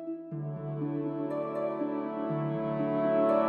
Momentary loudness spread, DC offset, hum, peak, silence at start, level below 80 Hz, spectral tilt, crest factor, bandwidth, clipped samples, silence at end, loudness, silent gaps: 10 LU; under 0.1%; none; -16 dBFS; 0 s; -70 dBFS; -10.5 dB/octave; 16 dB; 4.8 kHz; under 0.1%; 0 s; -32 LUFS; none